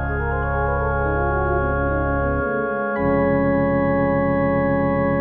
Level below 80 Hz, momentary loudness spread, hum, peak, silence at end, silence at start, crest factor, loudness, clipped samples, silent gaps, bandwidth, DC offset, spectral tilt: -30 dBFS; 4 LU; none; -8 dBFS; 0 s; 0 s; 12 dB; -20 LUFS; under 0.1%; none; 4.2 kHz; 0.1%; -12 dB/octave